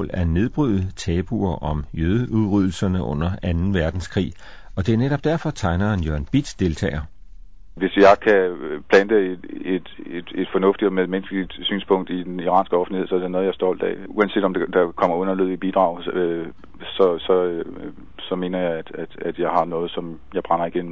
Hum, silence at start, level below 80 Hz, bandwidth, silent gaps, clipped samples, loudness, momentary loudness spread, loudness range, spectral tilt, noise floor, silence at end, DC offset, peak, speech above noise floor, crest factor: none; 0 s; -36 dBFS; 8 kHz; none; under 0.1%; -21 LUFS; 12 LU; 4 LU; -7 dB/octave; -43 dBFS; 0 s; 1%; -2 dBFS; 23 dB; 18 dB